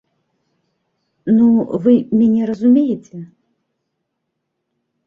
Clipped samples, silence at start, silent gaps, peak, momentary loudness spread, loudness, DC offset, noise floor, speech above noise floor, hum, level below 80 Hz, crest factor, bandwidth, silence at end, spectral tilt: under 0.1%; 1.25 s; none; -2 dBFS; 16 LU; -14 LUFS; under 0.1%; -74 dBFS; 61 dB; none; -60 dBFS; 16 dB; 3.6 kHz; 1.8 s; -9.5 dB/octave